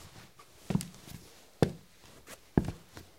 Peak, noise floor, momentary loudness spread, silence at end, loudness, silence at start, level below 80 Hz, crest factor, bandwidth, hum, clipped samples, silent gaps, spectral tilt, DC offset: -8 dBFS; -57 dBFS; 23 LU; 0.15 s; -34 LUFS; 0 s; -52 dBFS; 28 dB; 16.5 kHz; none; under 0.1%; none; -6.5 dB/octave; under 0.1%